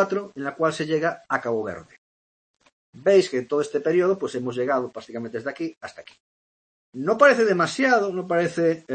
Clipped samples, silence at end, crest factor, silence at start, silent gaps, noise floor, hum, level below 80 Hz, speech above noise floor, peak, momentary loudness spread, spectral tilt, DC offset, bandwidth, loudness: under 0.1%; 0 s; 22 dB; 0 s; 1.98-2.54 s, 2.72-2.93 s, 5.77-5.81 s, 6.20-6.93 s; under -90 dBFS; none; -70 dBFS; over 67 dB; -2 dBFS; 15 LU; -5.5 dB/octave; under 0.1%; 8.8 kHz; -23 LUFS